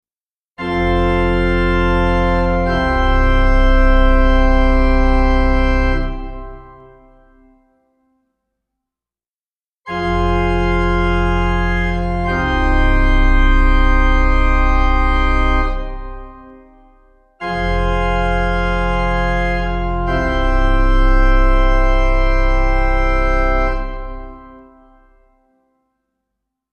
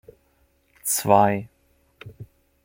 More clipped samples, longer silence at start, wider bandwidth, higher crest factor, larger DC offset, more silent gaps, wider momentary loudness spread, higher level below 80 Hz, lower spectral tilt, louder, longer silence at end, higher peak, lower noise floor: neither; second, 0.6 s vs 0.85 s; second, 6.6 kHz vs 16.5 kHz; second, 14 dB vs 24 dB; neither; first, 9.27-9.60 s, 9.66-9.82 s vs none; second, 10 LU vs 25 LU; first, -16 dBFS vs -60 dBFS; first, -7 dB/octave vs -4.5 dB/octave; first, -17 LUFS vs -21 LUFS; first, 2.35 s vs 0.4 s; about the same, -2 dBFS vs -2 dBFS; first, under -90 dBFS vs -64 dBFS